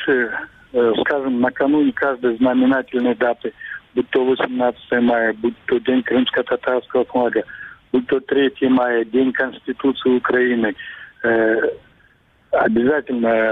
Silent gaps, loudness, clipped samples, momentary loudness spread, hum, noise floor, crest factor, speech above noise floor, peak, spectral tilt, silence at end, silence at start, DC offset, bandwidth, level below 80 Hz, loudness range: none; -18 LUFS; under 0.1%; 8 LU; none; -55 dBFS; 14 dB; 37 dB; -6 dBFS; -8 dB/octave; 0 s; 0 s; under 0.1%; 4 kHz; -56 dBFS; 1 LU